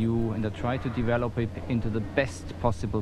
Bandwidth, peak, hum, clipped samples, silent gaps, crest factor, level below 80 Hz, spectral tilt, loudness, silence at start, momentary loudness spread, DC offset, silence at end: 11.5 kHz; -8 dBFS; none; under 0.1%; none; 20 dB; -40 dBFS; -7.5 dB/octave; -29 LUFS; 0 s; 3 LU; under 0.1%; 0 s